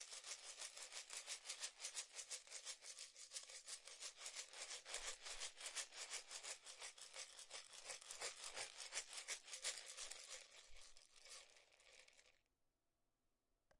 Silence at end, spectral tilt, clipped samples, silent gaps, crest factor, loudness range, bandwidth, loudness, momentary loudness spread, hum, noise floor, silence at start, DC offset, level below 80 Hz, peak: 0 s; 3 dB/octave; under 0.1%; none; 26 dB; 5 LU; 12 kHz; -52 LUFS; 13 LU; none; -89 dBFS; 0 s; under 0.1%; -80 dBFS; -30 dBFS